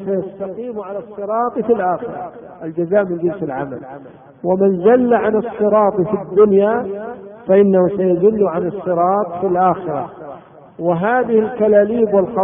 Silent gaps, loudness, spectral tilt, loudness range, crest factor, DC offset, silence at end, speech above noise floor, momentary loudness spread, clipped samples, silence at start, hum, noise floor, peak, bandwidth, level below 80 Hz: none; -16 LUFS; -13 dB/octave; 6 LU; 14 dB; under 0.1%; 0 s; 21 dB; 16 LU; under 0.1%; 0 s; none; -37 dBFS; -2 dBFS; 3.6 kHz; -54 dBFS